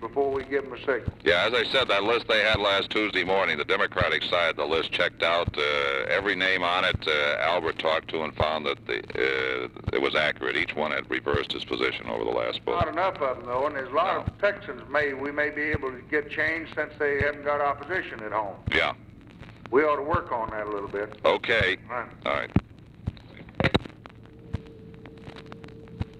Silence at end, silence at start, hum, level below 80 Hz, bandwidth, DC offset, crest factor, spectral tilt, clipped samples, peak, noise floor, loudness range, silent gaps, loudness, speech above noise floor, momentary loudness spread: 0 s; 0 s; none; -48 dBFS; 11.5 kHz; under 0.1%; 20 dB; -5.5 dB/octave; under 0.1%; -6 dBFS; -47 dBFS; 4 LU; none; -26 LUFS; 21 dB; 14 LU